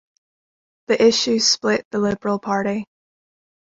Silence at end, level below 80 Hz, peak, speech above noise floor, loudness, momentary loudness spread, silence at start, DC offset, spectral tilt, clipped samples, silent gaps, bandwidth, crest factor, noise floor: 0.9 s; -58 dBFS; -4 dBFS; over 71 dB; -19 LUFS; 8 LU; 0.9 s; under 0.1%; -3 dB/octave; under 0.1%; 1.85-1.91 s; 8 kHz; 18 dB; under -90 dBFS